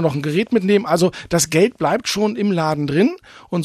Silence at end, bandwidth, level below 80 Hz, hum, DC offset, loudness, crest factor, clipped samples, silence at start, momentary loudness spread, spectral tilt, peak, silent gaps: 0 s; 14 kHz; -52 dBFS; none; under 0.1%; -18 LUFS; 14 dB; under 0.1%; 0 s; 4 LU; -5 dB/octave; -2 dBFS; none